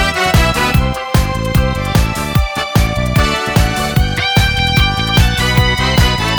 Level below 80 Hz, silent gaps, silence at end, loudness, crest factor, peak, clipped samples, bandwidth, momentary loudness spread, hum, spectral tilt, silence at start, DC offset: -18 dBFS; none; 0 s; -13 LUFS; 12 dB; 0 dBFS; under 0.1%; over 20 kHz; 4 LU; none; -4.5 dB/octave; 0 s; under 0.1%